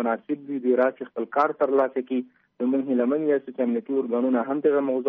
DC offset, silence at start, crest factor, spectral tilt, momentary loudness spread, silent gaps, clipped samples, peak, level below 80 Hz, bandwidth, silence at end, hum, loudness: under 0.1%; 0 s; 14 dB; -5.5 dB/octave; 8 LU; none; under 0.1%; -10 dBFS; -78 dBFS; 4.8 kHz; 0 s; none; -24 LUFS